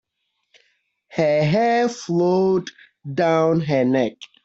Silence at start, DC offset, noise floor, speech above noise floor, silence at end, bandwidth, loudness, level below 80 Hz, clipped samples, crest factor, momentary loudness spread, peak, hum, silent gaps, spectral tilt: 1.1 s; under 0.1%; -74 dBFS; 55 dB; 0.2 s; 8 kHz; -20 LUFS; -60 dBFS; under 0.1%; 16 dB; 11 LU; -6 dBFS; none; none; -7 dB/octave